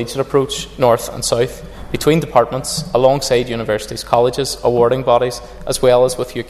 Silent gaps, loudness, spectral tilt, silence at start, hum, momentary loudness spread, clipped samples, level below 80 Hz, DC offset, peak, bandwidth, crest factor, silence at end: none; -16 LUFS; -4.5 dB/octave; 0 s; none; 8 LU; under 0.1%; -38 dBFS; under 0.1%; 0 dBFS; 14 kHz; 16 dB; 0 s